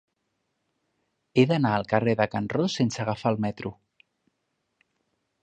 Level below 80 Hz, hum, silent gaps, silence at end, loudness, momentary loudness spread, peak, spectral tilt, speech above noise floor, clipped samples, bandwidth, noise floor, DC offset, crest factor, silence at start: -60 dBFS; none; none; 1.7 s; -25 LUFS; 8 LU; -6 dBFS; -6.5 dB/octave; 53 dB; under 0.1%; 9.2 kHz; -78 dBFS; under 0.1%; 22 dB; 1.35 s